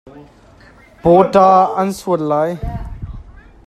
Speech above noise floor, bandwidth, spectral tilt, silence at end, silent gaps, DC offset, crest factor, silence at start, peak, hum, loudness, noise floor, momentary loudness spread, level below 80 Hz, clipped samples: 31 dB; 14.5 kHz; -7 dB/octave; 0.35 s; none; under 0.1%; 16 dB; 0.05 s; 0 dBFS; none; -14 LUFS; -44 dBFS; 20 LU; -34 dBFS; under 0.1%